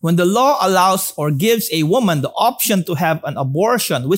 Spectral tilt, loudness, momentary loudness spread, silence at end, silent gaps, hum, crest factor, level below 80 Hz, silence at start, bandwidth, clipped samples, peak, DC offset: -4.5 dB/octave; -16 LUFS; 5 LU; 0 s; none; none; 14 dB; -62 dBFS; 0.05 s; 16.5 kHz; under 0.1%; -2 dBFS; under 0.1%